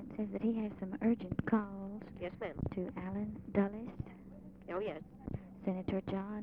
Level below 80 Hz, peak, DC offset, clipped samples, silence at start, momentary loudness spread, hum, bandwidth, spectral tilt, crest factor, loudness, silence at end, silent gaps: -58 dBFS; -18 dBFS; under 0.1%; under 0.1%; 0 s; 12 LU; none; 4.6 kHz; -10 dB/octave; 20 dB; -39 LUFS; 0 s; none